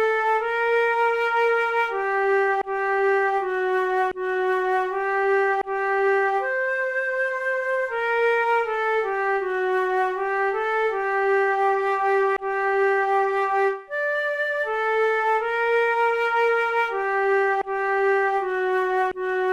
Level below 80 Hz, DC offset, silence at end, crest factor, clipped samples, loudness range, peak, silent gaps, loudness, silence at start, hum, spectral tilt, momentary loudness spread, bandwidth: -60 dBFS; under 0.1%; 0 s; 10 dB; under 0.1%; 1 LU; -12 dBFS; none; -22 LUFS; 0 s; none; -3.5 dB/octave; 3 LU; 11 kHz